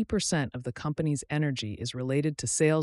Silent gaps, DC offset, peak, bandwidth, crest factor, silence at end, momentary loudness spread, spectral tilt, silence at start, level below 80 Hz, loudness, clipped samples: none; under 0.1%; -12 dBFS; 12 kHz; 16 dB; 0 s; 8 LU; -5 dB/octave; 0 s; -54 dBFS; -30 LUFS; under 0.1%